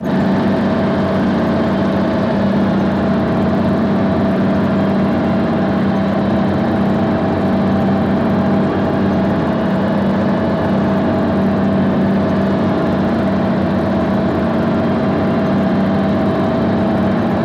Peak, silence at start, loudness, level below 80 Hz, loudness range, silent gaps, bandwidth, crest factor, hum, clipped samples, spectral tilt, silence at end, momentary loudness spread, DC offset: -4 dBFS; 0 s; -15 LUFS; -38 dBFS; 0 LU; none; 6.8 kHz; 10 dB; none; under 0.1%; -9 dB/octave; 0 s; 1 LU; under 0.1%